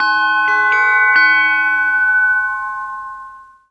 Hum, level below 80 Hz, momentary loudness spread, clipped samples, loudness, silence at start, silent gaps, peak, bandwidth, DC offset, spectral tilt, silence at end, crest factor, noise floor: none; -54 dBFS; 16 LU; under 0.1%; -12 LUFS; 0 s; none; -2 dBFS; 9.2 kHz; under 0.1%; -1.5 dB/octave; 0.3 s; 14 dB; -37 dBFS